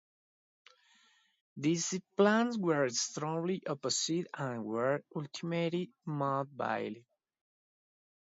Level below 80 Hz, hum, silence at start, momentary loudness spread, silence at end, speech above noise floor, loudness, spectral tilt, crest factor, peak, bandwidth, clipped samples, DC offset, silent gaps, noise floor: -82 dBFS; none; 1.55 s; 10 LU; 1.35 s; 35 dB; -34 LUFS; -4.5 dB/octave; 20 dB; -16 dBFS; 7.6 kHz; under 0.1%; under 0.1%; none; -68 dBFS